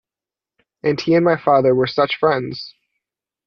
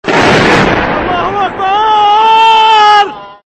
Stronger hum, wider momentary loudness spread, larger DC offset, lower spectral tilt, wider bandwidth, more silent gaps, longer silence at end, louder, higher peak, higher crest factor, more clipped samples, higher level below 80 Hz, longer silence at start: neither; first, 14 LU vs 8 LU; neither; first, -7 dB/octave vs -4.5 dB/octave; second, 6.6 kHz vs 9.4 kHz; neither; first, 0.75 s vs 0.1 s; second, -17 LUFS vs -7 LUFS; about the same, -2 dBFS vs 0 dBFS; first, 16 dB vs 8 dB; neither; second, -58 dBFS vs -34 dBFS; first, 0.85 s vs 0.05 s